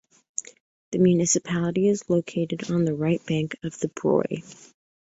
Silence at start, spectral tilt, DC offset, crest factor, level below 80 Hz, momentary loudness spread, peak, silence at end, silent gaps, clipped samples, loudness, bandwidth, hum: 0.4 s; -5.5 dB/octave; under 0.1%; 16 dB; -62 dBFS; 13 LU; -8 dBFS; 0.5 s; 0.60-0.92 s; under 0.1%; -25 LUFS; 8 kHz; none